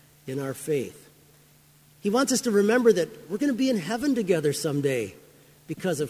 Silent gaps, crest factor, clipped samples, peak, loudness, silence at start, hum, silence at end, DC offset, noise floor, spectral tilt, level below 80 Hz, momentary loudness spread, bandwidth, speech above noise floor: none; 18 dB; under 0.1%; -8 dBFS; -25 LUFS; 0.25 s; none; 0 s; under 0.1%; -57 dBFS; -5 dB/octave; -66 dBFS; 12 LU; 16 kHz; 32 dB